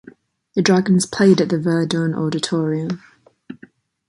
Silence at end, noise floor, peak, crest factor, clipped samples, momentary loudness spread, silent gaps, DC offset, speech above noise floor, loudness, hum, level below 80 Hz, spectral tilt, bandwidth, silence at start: 0.55 s; -49 dBFS; -2 dBFS; 16 dB; under 0.1%; 10 LU; none; under 0.1%; 32 dB; -18 LUFS; none; -60 dBFS; -5.5 dB/octave; 11.5 kHz; 0.55 s